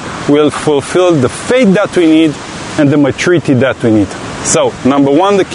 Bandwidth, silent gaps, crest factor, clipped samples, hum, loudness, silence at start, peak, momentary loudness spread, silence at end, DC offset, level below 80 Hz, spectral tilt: 11 kHz; none; 10 dB; under 0.1%; none; -10 LUFS; 0 s; 0 dBFS; 5 LU; 0 s; under 0.1%; -42 dBFS; -5 dB/octave